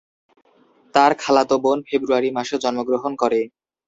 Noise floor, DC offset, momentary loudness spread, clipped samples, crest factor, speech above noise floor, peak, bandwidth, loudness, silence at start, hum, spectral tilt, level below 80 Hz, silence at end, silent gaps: -53 dBFS; under 0.1%; 6 LU; under 0.1%; 18 dB; 34 dB; -2 dBFS; 8 kHz; -19 LUFS; 0.95 s; none; -4 dB/octave; -64 dBFS; 0.4 s; none